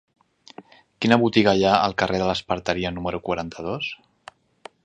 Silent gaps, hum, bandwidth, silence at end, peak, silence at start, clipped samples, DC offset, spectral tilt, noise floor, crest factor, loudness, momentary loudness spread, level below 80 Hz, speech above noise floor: none; none; 9.4 kHz; 0.9 s; 0 dBFS; 0.6 s; under 0.1%; under 0.1%; -5.5 dB/octave; -49 dBFS; 24 dB; -22 LUFS; 12 LU; -50 dBFS; 27 dB